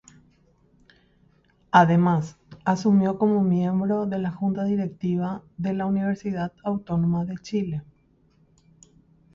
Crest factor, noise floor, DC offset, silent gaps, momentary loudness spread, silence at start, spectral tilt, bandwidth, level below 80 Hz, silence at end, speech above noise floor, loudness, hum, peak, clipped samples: 22 dB; -61 dBFS; under 0.1%; none; 11 LU; 1.75 s; -8 dB/octave; 7.4 kHz; -58 dBFS; 1.5 s; 39 dB; -24 LUFS; none; -4 dBFS; under 0.1%